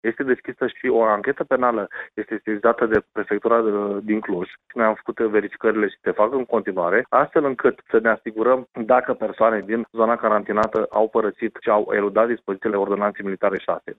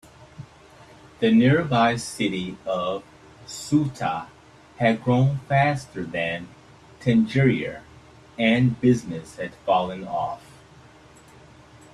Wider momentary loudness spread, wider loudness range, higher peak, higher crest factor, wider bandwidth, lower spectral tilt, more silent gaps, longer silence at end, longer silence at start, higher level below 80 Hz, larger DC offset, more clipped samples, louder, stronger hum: second, 7 LU vs 17 LU; about the same, 2 LU vs 3 LU; first, -2 dBFS vs -6 dBFS; about the same, 18 dB vs 18 dB; second, 5.6 kHz vs 12.5 kHz; first, -8.5 dB/octave vs -6.5 dB/octave; neither; second, 0.05 s vs 1.55 s; second, 0.05 s vs 0.4 s; about the same, -60 dBFS vs -56 dBFS; neither; neither; about the same, -21 LUFS vs -23 LUFS; neither